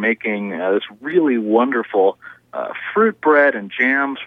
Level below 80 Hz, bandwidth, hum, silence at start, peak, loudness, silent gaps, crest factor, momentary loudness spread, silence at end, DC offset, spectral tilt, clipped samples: -72 dBFS; 4.2 kHz; none; 0 s; -2 dBFS; -17 LUFS; none; 16 dB; 10 LU; 0 s; under 0.1%; -7.5 dB/octave; under 0.1%